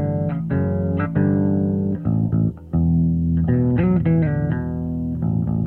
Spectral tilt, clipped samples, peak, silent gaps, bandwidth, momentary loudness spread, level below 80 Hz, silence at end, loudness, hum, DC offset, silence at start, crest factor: -12.5 dB/octave; under 0.1%; -8 dBFS; none; 3.2 kHz; 5 LU; -36 dBFS; 0 s; -20 LUFS; none; under 0.1%; 0 s; 12 dB